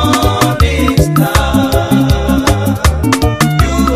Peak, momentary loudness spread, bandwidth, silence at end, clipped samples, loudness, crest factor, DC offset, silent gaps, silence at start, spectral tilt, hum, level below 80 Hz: 0 dBFS; 2 LU; 16 kHz; 0 s; under 0.1%; -11 LUFS; 10 dB; under 0.1%; none; 0 s; -5.5 dB/octave; none; -18 dBFS